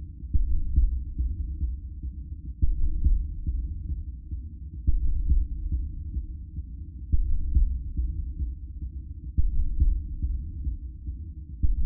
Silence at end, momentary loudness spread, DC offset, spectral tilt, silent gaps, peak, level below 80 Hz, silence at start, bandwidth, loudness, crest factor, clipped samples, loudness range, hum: 0 s; 11 LU; under 0.1%; -18 dB/octave; none; -10 dBFS; -28 dBFS; 0 s; 0.4 kHz; -32 LUFS; 16 dB; under 0.1%; 2 LU; none